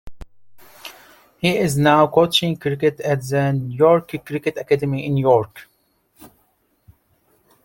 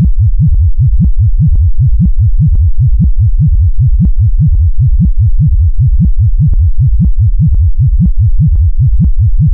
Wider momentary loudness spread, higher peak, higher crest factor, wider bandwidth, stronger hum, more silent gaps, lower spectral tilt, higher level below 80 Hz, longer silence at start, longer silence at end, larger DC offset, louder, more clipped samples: first, 15 LU vs 1 LU; about the same, -2 dBFS vs -2 dBFS; first, 18 dB vs 4 dB; first, 17 kHz vs 0.6 kHz; neither; neither; second, -5.5 dB/octave vs -17 dB/octave; second, -50 dBFS vs -8 dBFS; about the same, 0.05 s vs 0 s; first, 1.4 s vs 0 s; neither; second, -18 LUFS vs -10 LUFS; neither